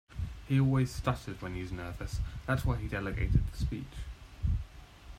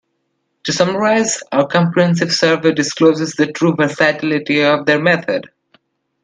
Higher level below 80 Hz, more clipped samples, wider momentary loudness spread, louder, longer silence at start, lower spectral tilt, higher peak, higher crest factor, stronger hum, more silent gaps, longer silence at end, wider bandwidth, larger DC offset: first, -40 dBFS vs -60 dBFS; neither; first, 14 LU vs 5 LU; second, -34 LUFS vs -15 LUFS; second, 0.1 s vs 0.65 s; first, -7 dB/octave vs -4.5 dB/octave; second, -14 dBFS vs 0 dBFS; about the same, 18 dB vs 16 dB; neither; neither; second, 0 s vs 0.75 s; first, 15.5 kHz vs 10 kHz; neither